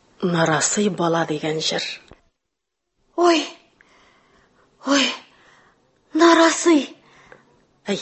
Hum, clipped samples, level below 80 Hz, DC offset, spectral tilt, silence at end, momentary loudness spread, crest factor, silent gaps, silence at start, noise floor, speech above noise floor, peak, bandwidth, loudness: none; under 0.1%; -66 dBFS; under 0.1%; -3.5 dB/octave; 0 s; 18 LU; 20 dB; none; 0.2 s; -80 dBFS; 62 dB; -2 dBFS; 8.6 kHz; -19 LUFS